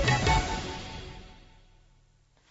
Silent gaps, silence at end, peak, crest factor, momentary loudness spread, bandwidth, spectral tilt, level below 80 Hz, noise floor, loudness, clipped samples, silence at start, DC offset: none; 1.05 s; -14 dBFS; 18 dB; 21 LU; 8 kHz; -4.5 dB/octave; -38 dBFS; -63 dBFS; -29 LUFS; under 0.1%; 0 s; under 0.1%